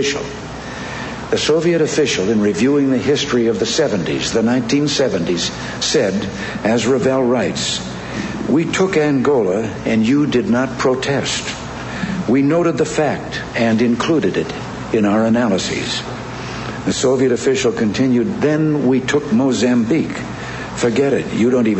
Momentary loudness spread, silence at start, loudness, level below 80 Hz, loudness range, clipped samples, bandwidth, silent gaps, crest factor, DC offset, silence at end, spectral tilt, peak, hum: 10 LU; 0 s; -17 LUFS; -44 dBFS; 2 LU; under 0.1%; 8.4 kHz; none; 12 dB; under 0.1%; 0 s; -5 dB/octave; -4 dBFS; none